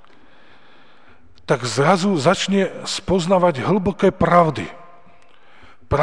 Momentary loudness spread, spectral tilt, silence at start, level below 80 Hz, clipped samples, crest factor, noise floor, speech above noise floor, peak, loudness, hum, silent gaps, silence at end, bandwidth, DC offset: 9 LU; -5.5 dB/octave; 1.5 s; -44 dBFS; under 0.1%; 20 dB; -52 dBFS; 34 dB; 0 dBFS; -18 LUFS; none; none; 0 s; 10 kHz; 0.8%